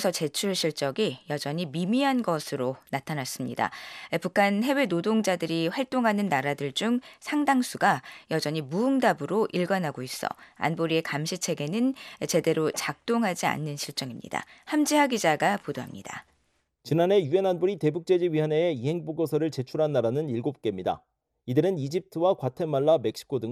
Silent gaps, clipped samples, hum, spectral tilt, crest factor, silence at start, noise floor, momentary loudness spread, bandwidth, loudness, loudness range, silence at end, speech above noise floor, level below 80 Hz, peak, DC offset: none; under 0.1%; none; -5 dB/octave; 18 dB; 0 s; -72 dBFS; 9 LU; 14.5 kHz; -27 LUFS; 2 LU; 0 s; 45 dB; -70 dBFS; -8 dBFS; under 0.1%